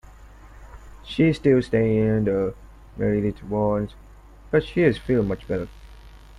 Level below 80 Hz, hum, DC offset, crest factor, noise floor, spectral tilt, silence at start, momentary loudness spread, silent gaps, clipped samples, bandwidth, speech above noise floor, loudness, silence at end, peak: -42 dBFS; 50 Hz at -45 dBFS; under 0.1%; 20 dB; -45 dBFS; -8.5 dB/octave; 0.05 s; 11 LU; none; under 0.1%; 11 kHz; 24 dB; -23 LUFS; 0.2 s; -4 dBFS